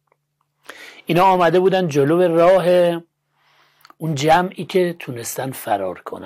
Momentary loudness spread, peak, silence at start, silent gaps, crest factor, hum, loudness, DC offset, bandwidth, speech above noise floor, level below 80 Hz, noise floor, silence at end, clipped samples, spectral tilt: 15 LU; -6 dBFS; 0.8 s; none; 12 dB; none; -17 LUFS; under 0.1%; 16 kHz; 53 dB; -58 dBFS; -70 dBFS; 0 s; under 0.1%; -5.5 dB/octave